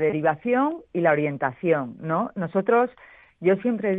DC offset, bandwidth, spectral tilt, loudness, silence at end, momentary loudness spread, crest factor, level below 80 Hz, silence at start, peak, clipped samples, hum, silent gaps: under 0.1%; 3.9 kHz; -10 dB/octave; -24 LUFS; 0 s; 5 LU; 16 dB; -66 dBFS; 0 s; -6 dBFS; under 0.1%; none; none